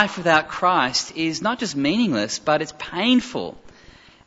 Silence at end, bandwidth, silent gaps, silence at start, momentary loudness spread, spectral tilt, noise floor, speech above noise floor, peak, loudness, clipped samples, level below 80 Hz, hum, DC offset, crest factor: 0.55 s; 8 kHz; none; 0 s; 9 LU; -3.5 dB/octave; -48 dBFS; 27 dB; -2 dBFS; -21 LUFS; under 0.1%; -56 dBFS; none; under 0.1%; 20 dB